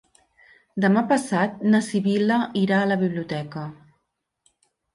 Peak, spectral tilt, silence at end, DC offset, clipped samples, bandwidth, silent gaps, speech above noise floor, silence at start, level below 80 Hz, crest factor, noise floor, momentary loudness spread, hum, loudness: -8 dBFS; -6.5 dB/octave; 1.2 s; under 0.1%; under 0.1%; 11.5 kHz; none; 55 dB; 0.75 s; -66 dBFS; 16 dB; -76 dBFS; 13 LU; none; -22 LUFS